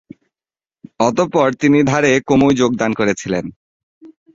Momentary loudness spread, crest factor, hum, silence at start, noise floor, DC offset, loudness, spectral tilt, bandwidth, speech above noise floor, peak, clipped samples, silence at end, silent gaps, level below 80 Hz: 8 LU; 16 dB; none; 1 s; under -90 dBFS; under 0.1%; -15 LUFS; -5.5 dB/octave; 7.8 kHz; over 76 dB; -2 dBFS; under 0.1%; 0.3 s; 3.56-4.01 s; -48 dBFS